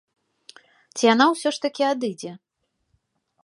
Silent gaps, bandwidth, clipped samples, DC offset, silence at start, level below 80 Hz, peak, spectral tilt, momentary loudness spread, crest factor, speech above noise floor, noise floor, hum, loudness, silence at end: none; 11.5 kHz; under 0.1%; under 0.1%; 0.95 s; -76 dBFS; -4 dBFS; -3.5 dB/octave; 19 LU; 20 dB; 53 dB; -74 dBFS; none; -21 LUFS; 1.1 s